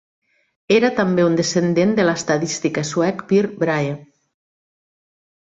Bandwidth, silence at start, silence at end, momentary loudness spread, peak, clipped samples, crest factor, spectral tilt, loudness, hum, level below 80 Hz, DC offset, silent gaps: 8 kHz; 0.7 s; 1.55 s; 5 LU; -2 dBFS; under 0.1%; 16 dB; -5 dB/octave; -18 LUFS; none; -58 dBFS; under 0.1%; none